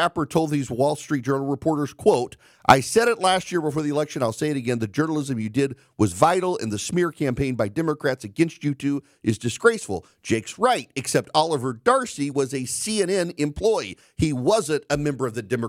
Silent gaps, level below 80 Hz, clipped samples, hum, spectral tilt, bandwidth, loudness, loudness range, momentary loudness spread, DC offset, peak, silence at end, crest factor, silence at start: none; -52 dBFS; under 0.1%; none; -5 dB/octave; 16 kHz; -23 LUFS; 3 LU; 7 LU; under 0.1%; -2 dBFS; 0 s; 20 dB; 0 s